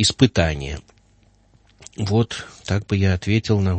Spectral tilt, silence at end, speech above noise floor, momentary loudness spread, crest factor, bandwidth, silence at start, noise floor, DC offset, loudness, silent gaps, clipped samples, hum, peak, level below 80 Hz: -5.5 dB/octave; 0 s; 37 dB; 14 LU; 20 dB; 8.8 kHz; 0 s; -56 dBFS; under 0.1%; -21 LUFS; none; under 0.1%; none; 0 dBFS; -38 dBFS